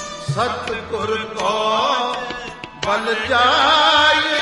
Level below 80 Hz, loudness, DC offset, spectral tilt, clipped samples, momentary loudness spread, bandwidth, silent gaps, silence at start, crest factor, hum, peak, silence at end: -50 dBFS; -17 LUFS; under 0.1%; -3 dB/octave; under 0.1%; 13 LU; 11.5 kHz; none; 0 s; 16 dB; none; -2 dBFS; 0 s